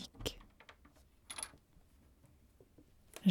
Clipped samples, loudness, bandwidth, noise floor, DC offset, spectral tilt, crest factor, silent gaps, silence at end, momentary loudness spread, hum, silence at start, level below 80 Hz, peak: under 0.1%; -44 LUFS; 19 kHz; -66 dBFS; under 0.1%; -5 dB/octave; 26 dB; none; 0 s; 23 LU; none; 0 s; -62 dBFS; -18 dBFS